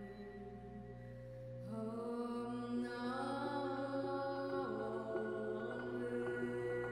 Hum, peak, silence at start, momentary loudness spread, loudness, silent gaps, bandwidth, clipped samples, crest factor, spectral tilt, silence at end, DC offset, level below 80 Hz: none; -30 dBFS; 0 s; 11 LU; -43 LUFS; none; 11.5 kHz; under 0.1%; 14 dB; -7 dB/octave; 0 s; under 0.1%; -68 dBFS